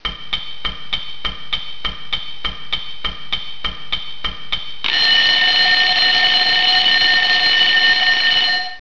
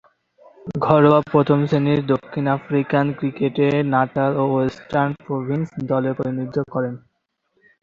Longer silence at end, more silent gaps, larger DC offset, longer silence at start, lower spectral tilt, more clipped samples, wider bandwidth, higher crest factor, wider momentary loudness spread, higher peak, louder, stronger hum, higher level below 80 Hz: second, 0.05 s vs 0.85 s; neither; first, 6% vs under 0.1%; second, 0 s vs 0.65 s; second, -1 dB/octave vs -9 dB/octave; neither; second, 5.4 kHz vs 7 kHz; about the same, 16 dB vs 20 dB; first, 14 LU vs 9 LU; about the same, -2 dBFS vs 0 dBFS; first, -14 LUFS vs -20 LUFS; neither; first, -40 dBFS vs -56 dBFS